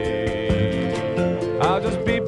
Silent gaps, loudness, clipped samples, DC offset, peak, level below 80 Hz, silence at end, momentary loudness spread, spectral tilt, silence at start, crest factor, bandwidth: none; -22 LUFS; under 0.1%; under 0.1%; -6 dBFS; -38 dBFS; 0 s; 3 LU; -7 dB/octave; 0 s; 16 dB; 11.5 kHz